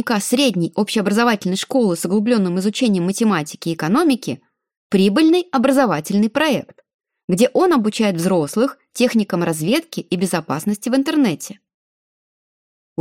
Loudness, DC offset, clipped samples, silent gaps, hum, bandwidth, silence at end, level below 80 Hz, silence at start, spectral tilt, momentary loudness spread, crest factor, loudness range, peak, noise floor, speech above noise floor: -18 LUFS; under 0.1%; under 0.1%; 4.77-4.90 s, 6.94-6.99 s, 7.24-7.28 s; none; 16.5 kHz; 1.45 s; -64 dBFS; 0 s; -5 dB/octave; 7 LU; 16 dB; 3 LU; -2 dBFS; under -90 dBFS; over 73 dB